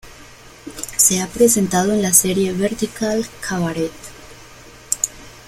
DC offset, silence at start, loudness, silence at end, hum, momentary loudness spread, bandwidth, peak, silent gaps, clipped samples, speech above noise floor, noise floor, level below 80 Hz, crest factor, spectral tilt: under 0.1%; 0.05 s; -17 LUFS; 0.05 s; none; 17 LU; 16.5 kHz; 0 dBFS; none; under 0.1%; 24 dB; -42 dBFS; -46 dBFS; 20 dB; -3.5 dB/octave